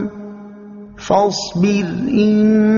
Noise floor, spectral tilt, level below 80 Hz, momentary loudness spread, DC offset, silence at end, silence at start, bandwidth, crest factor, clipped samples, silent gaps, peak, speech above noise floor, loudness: -35 dBFS; -6 dB/octave; -48 dBFS; 23 LU; under 0.1%; 0 s; 0 s; 7.4 kHz; 14 dB; under 0.1%; none; -2 dBFS; 22 dB; -16 LUFS